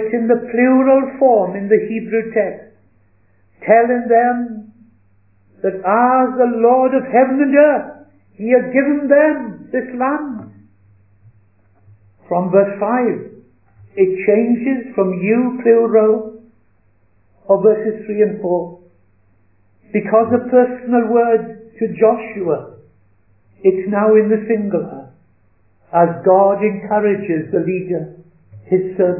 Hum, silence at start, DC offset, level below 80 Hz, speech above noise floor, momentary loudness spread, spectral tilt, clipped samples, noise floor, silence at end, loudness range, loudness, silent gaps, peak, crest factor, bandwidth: none; 0 s; 0.1%; -64 dBFS; 44 dB; 11 LU; -12.5 dB/octave; under 0.1%; -58 dBFS; 0 s; 5 LU; -15 LUFS; none; 0 dBFS; 16 dB; 3 kHz